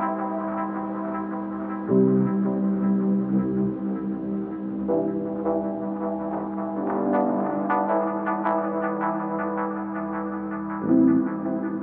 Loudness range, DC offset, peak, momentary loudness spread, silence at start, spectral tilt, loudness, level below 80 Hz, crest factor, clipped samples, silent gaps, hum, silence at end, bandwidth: 3 LU; under 0.1%; -8 dBFS; 9 LU; 0 s; -9.5 dB/octave; -25 LUFS; -58 dBFS; 16 dB; under 0.1%; none; none; 0 s; 3.4 kHz